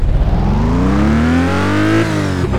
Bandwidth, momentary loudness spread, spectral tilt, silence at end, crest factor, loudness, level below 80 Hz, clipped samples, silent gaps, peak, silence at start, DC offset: 13 kHz; 3 LU; -7 dB/octave; 0 s; 10 dB; -14 LUFS; -18 dBFS; under 0.1%; none; -2 dBFS; 0 s; under 0.1%